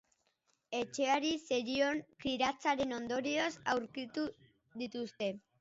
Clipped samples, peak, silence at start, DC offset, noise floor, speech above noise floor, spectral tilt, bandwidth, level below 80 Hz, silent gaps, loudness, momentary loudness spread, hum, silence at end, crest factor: under 0.1%; -20 dBFS; 0.7 s; under 0.1%; -79 dBFS; 43 dB; -1.5 dB/octave; 7.6 kHz; -70 dBFS; none; -36 LUFS; 9 LU; none; 0.2 s; 18 dB